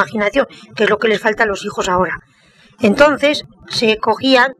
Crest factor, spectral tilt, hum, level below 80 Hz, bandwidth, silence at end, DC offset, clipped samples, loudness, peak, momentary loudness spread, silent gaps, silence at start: 16 dB; -4 dB/octave; none; -44 dBFS; 13.5 kHz; 0.05 s; under 0.1%; under 0.1%; -15 LUFS; 0 dBFS; 10 LU; none; 0 s